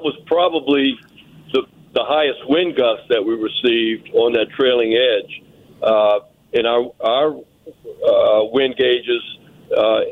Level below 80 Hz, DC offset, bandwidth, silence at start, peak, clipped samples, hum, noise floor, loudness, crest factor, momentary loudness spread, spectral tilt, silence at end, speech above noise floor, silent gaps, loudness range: -60 dBFS; under 0.1%; 4.9 kHz; 0 s; -4 dBFS; under 0.1%; none; -38 dBFS; -17 LUFS; 12 dB; 8 LU; -6 dB/octave; 0 s; 21 dB; none; 2 LU